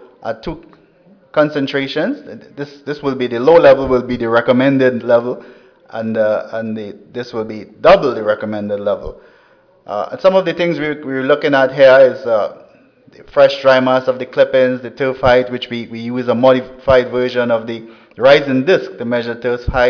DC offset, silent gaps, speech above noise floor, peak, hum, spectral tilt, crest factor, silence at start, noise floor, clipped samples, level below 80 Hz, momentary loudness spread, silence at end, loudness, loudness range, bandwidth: under 0.1%; none; 36 dB; 0 dBFS; none; -6.5 dB/octave; 14 dB; 0.2 s; -50 dBFS; under 0.1%; -40 dBFS; 16 LU; 0 s; -14 LUFS; 5 LU; 5.4 kHz